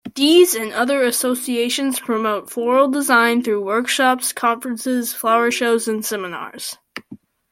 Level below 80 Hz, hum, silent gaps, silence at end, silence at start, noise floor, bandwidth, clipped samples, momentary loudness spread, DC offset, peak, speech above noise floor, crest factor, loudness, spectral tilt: -66 dBFS; none; none; 0.35 s; 0.05 s; -43 dBFS; 16.5 kHz; under 0.1%; 14 LU; under 0.1%; -2 dBFS; 25 dB; 16 dB; -18 LUFS; -2 dB/octave